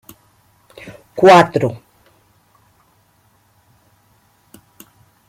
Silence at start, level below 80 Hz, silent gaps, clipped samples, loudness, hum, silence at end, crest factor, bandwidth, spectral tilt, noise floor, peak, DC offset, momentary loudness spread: 1.15 s; -58 dBFS; none; under 0.1%; -12 LUFS; none; 3.55 s; 18 dB; 16 kHz; -5.5 dB/octave; -57 dBFS; 0 dBFS; under 0.1%; 30 LU